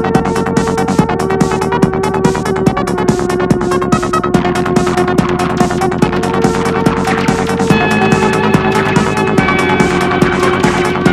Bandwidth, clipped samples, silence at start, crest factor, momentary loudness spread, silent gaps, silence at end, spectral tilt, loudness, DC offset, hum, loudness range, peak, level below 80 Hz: 14 kHz; 0.2%; 0 s; 12 dB; 3 LU; none; 0 s; -6 dB/octave; -12 LUFS; under 0.1%; none; 2 LU; 0 dBFS; -32 dBFS